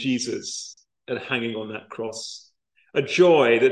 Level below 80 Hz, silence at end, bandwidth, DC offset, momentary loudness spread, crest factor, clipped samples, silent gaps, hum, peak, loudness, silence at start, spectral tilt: -70 dBFS; 0 s; 10 kHz; under 0.1%; 18 LU; 18 dB; under 0.1%; none; none; -4 dBFS; -23 LUFS; 0 s; -4 dB/octave